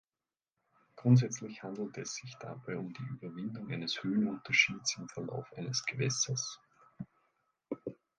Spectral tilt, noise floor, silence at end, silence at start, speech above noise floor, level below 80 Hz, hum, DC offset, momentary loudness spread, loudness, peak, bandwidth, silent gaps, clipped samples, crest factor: -4 dB/octave; under -90 dBFS; 0.25 s; 0.95 s; over 56 dB; -74 dBFS; none; under 0.1%; 18 LU; -34 LUFS; -12 dBFS; 10 kHz; none; under 0.1%; 24 dB